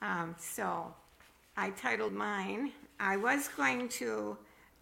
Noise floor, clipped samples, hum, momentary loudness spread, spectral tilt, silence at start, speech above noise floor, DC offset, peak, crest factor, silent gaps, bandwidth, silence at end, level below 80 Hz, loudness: -63 dBFS; under 0.1%; none; 11 LU; -3.5 dB/octave; 0 s; 27 dB; under 0.1%; -16 dBFS; 20 dB; none; 16.5 kHz; 0.35 s; -72 dBFS; -35 LUFS